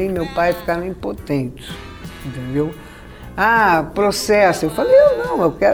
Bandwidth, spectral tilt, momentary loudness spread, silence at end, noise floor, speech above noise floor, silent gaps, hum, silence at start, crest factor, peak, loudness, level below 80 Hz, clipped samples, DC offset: over 20 kHz; -5 dB/octave; 20 LU; 0 s; -36 dBFS; 20 dB; none; none; 0 s; 14 dB; -2 dBFS; -17 LUFS; -40 dBFS; under 0.1%; under 0.1%